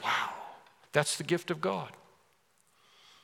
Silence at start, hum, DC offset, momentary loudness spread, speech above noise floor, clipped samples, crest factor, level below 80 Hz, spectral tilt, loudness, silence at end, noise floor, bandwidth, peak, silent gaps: 0 s; none; under 0.1%; 16 LU; 38 dB; under 0.1%; 28 dB; -84 dBFS; -3.5 dB/octave; -32 LUFS; 1.25 s; -70 dBFS; 17.5 kHz; -8 dBFS; none